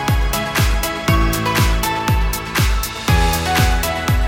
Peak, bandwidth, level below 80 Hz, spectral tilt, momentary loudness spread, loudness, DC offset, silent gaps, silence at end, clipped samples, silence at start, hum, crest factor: -2 dBFS; 18 kHz; -20 dBFS; -4.5 dB/octave; 3 LU; -17 LUFS; under 0.1%; none; 0 s; under 0.1%; 0 s; none; 14 dB